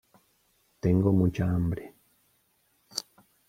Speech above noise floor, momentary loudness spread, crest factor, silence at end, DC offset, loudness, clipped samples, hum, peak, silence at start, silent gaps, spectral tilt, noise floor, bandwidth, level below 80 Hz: 45 dB; 14 LU; 20 dB; 0.5 s; under 0.1%; -28 LUFS; under 0.1%; none; -10 dBFS; 0.85 s; none; -7 dB/octave; -70 dBFS; 15 kHz; -52 dBFS